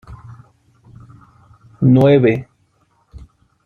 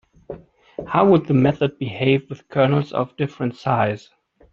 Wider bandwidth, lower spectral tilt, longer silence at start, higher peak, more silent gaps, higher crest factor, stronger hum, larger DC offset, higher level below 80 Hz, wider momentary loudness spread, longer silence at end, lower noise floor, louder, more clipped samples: second, 4.4 kHz vs 7 kHz; first, -10 dB/octave vs -8.5 dB/octave; second, 0.1 s vs 0.3 s; about the same, -2 dBFS vs -2 dBFS; neither; about the same, 16 dB vs 18 dB; neither; neither; first, -48 dBFS vs -54 dBFS; first, 28 LU vs 22 LU; about the same, 0.5 s vs 0.55 s; first, -60 dBFS vs -39 dBFS; first, -13 LUFS vs -20 LUFS; neither